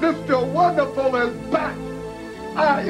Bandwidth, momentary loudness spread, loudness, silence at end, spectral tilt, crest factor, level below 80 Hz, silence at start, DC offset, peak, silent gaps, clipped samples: 13.5 kHz; 14 LU; -21 LUFS; 0 s; -6.5 dB/octave; 16 dB; -48 dBFS; 0 s; under 0.1%; -6 dBFS; none; under 0.1%